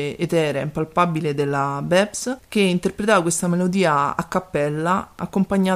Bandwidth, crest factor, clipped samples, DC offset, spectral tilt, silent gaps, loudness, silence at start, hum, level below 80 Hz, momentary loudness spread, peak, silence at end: 15.5 kHz; 18 dB; under 0.1%; under 0.1%; -5 dB/octave; none; -21 LUFS; 0 s; none; -52 dBFS; 6 LU; -2 dBFS; 0 s